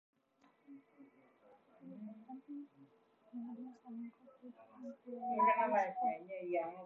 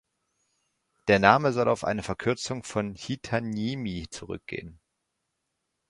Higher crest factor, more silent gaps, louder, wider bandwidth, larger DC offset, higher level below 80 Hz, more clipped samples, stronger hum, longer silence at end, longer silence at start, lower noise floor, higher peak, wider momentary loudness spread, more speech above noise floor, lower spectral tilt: about the same, 22 dB vs 26 dB; neither; second, -38 LUFS vs -27 LUFS; second, 6.8 kHz vs 11.5 kHz; neither; second, under -90 dBFS vs -54 dBFS; neither; neither; second, 0 s vs 1.15 s; second, 0.7 s vs 1.05 s; second, -73 dBFS vs -81 dBFS; second, -20 dBFS vs -2 dBFS; first, 26 LU vs 17 LU; second, 34 dB vs 54 dB; about the same, -4.5 dB/octave vs -5.5 dB/octave